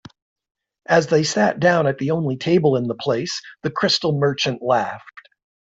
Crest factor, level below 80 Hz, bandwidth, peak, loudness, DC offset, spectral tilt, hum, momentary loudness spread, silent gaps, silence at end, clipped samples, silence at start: 18 dB; -60 dBFS; 8 kHz; -4 dBFS; -19 LUFS; under 0.1%; -5 dB/octave; none; 9 LU; none; 0.45 s; under 0.1%; 0.9 s